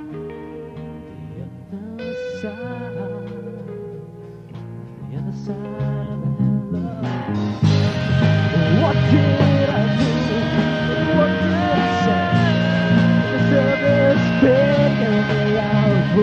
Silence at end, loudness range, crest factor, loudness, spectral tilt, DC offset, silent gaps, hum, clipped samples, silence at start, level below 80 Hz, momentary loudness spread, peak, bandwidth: 0 s; 14 LU; 16 dB; -18 LUFS; -7.5 dB/octave; under 0.1%; none; none; under 0.1%; 0 s; -44 dBFS; 18 LU; -2 dBFS; 8 kHz